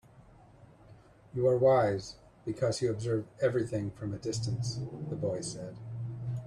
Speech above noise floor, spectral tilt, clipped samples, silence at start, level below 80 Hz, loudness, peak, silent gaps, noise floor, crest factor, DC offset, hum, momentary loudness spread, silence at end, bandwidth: 26 dB; -6 dB/octave; under 0.1%; 0.2 s; -60 dBFS; -32 LUFS; -14 dBFS; none; -57 dBFS; 18 dB; under 0.1%; none; 15 LU; 0 s; 11.5 kHz